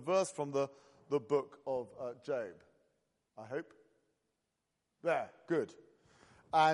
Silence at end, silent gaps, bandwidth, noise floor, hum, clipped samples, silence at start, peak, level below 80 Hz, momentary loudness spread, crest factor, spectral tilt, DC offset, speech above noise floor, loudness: 0 s; none; 11.5 kHz; -86 dBFS; none; under 0.1%; 0 s; -16 dBFS; -82 dBFS; 11 LU; 20 dB; -5 dB/octave; under 0.1%; 49 dB; -38 LUFS